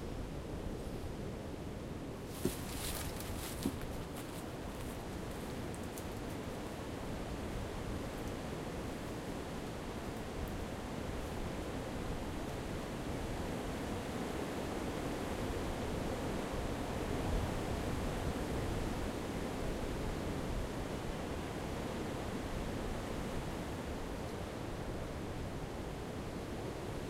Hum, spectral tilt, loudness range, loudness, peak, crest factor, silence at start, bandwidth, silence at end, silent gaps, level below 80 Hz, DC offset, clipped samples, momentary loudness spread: none; -5.5 dB/octave; 4 LU; -42 LUFS; -20 dBFS; 20 dB; 0 s; 16 kHz; 0 s; none; -48 dBFS; under 0.1%; under 0.1%; 5 LU